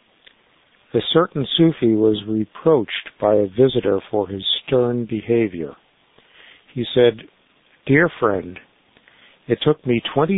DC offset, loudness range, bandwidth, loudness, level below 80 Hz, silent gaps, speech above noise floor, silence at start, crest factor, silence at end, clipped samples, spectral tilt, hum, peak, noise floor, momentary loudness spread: under 0.1%; 4 LU; 4.1 kHz; -19 LUFS; -52 dBFS; none; 39 dB; 0.95 s; 18 dB; 0 s; under 0.1%; -11 dB/octave; none; -2 dBFS; -57 dBFS; 10 LU